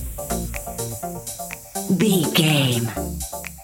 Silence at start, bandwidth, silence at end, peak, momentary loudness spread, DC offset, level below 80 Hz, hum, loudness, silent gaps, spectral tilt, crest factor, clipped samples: 0 s; 17 kHz; 0 s; -4 dBFS; 13 LU; under 0.1%; -38 dBFS; none; -22 LUFS; none; -4.5 dB/octave; 20 dB; under 0.1%